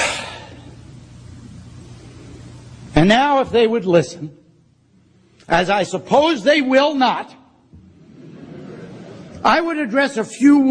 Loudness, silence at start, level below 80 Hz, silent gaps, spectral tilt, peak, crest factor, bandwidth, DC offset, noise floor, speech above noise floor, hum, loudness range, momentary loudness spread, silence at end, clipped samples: -16 LUFS; 0 s; -42 dBFS; none; -5 dB/octave; 0 dBFS; 18 dB; 10 kHz; under 0.1%; -54 dBFS; 39 dB; none; 4 LU; 25 LU; 0 s; under 0.1%